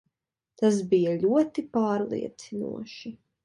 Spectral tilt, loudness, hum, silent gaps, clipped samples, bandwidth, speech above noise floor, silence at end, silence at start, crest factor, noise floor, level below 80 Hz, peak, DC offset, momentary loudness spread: -6.5 dB/octave; -26 LUFS; none; none; under 0.1%; 11 kHz; 57 dB; 0.3 s; 0.6 s; 16 dB; -83 dBFS; -70 dBFS; -10 dBFS; under 0.1%; 15 LU